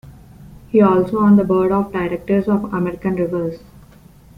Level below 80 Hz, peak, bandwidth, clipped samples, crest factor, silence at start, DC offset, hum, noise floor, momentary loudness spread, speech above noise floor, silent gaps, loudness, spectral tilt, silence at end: -46 dBFS; -2 dBFS; 4.9 kHz; under 0.1%; 16 dB; 0.05 s; under 0.1%; none; -45 dBFS; 9 LU; 29 dB; none; -17 LUFS; -9.5 dB/octave; 0.8 s